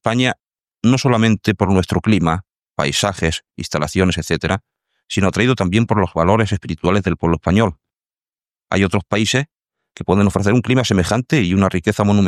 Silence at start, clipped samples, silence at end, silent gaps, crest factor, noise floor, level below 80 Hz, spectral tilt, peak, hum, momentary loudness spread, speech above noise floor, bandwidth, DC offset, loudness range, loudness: 0.05 s; under 0.1%; 0 s; none; 16 dB; under -90 dBFS; -40 dBFS; -5.5 dB/octave; -2 dBFS; none; 7 LU; over 74 dB; 14 kHz; under 0.1%; 2 LU; -17 LUFS